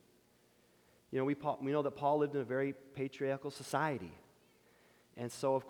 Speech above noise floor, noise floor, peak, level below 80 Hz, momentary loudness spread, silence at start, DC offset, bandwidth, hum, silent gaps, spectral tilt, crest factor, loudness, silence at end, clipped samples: 33 dB; -70 dBFS; -20 dBFS; -78 dBFS; 11 LU; 1.1 s; under 0.1%; 19.5 kHz; 60 Hz at -75 dBFS; none; -6 dB/octave; 20 dB; -37 LUFS; 0 s; under 0.1%